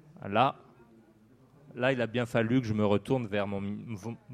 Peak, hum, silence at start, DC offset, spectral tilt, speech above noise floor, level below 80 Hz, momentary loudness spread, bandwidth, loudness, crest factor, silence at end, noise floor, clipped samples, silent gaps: -10 dBFS; none; 0.2 s; under 0.1%; -7 dB/octave; 31 dB; -66 dBFS; 12 LU; 14 kHz; -30 LUFS; 20 dB; 0 s; -60 dBFS; under 0.1%; none